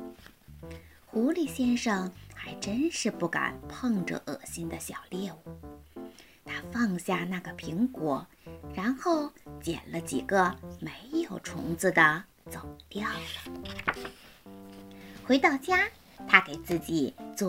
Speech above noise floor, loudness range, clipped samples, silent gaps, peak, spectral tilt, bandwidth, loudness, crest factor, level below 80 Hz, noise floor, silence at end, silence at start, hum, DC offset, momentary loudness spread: 22 dB; 8 LU; under 0.1%; none; -2 dBFS; -4.5 dB/octave; 16 kHz; -30 LUFS; 30 dB; -58 dBFS; -52 dBFS; 0 s; 0 s; none; under 0.1%; 22 LU